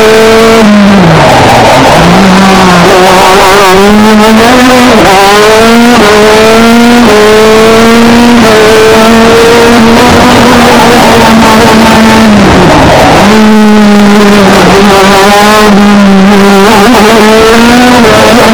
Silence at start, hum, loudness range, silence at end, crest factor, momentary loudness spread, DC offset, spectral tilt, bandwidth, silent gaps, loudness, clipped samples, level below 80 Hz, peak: 0 s; none; 0 LU; 0 s; 2 dB; 0 LU; 8%; -4.5 dB/octave; over 20 kHz; none; -1 LUFS; 40%; -22 dBFS; 0 dBFS